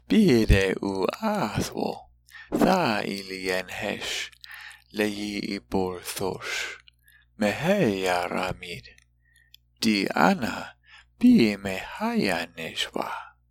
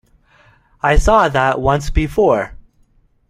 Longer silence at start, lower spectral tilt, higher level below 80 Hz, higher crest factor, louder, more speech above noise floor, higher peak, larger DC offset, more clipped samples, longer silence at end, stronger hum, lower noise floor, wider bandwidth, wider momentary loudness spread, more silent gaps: second, 0.1 s vs 0.85 s; about the same, -5 dB/octave vs -6 dB/octave; second, -40 dBFS vs -24 dBFS; first, 22 dB vs 16 dB; second, -25 LUFS vs -15 LUFS; second, 37 dB vs 41 dB; second, -4 dBFS vs 0 dBFS; neither; neither; second, 0.2 s vs 0.75 s; first, 60 Hz at -55 dBFS vs none; first, -62 dBFS vs -55 dBFS; first, 17 kHz vs 13.5 kHz; first, 16 LU vs 7 LU; neither